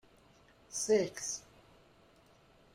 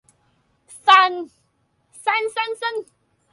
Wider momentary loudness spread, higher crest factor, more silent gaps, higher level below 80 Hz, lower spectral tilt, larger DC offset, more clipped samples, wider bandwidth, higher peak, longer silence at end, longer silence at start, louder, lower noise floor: second, 12 LU vs 19 LU; about the same, 20 dB vs 22 dB; neither; about the same, -72 dBFS vs -74 dBFS; first, -3 dB/octave vs -0.5 dB/octave; neither; neither; first, 16 kHz vs 11.5 kHz; second, -20 dBFS vs 0 dBFS; first, 1.35 s vs 0.5 s; about the same, 0.7 s vs 0.7 s; second, -35 LUFS vs -18 LUFS; about the same, -64 dBFS vs -66 dBFS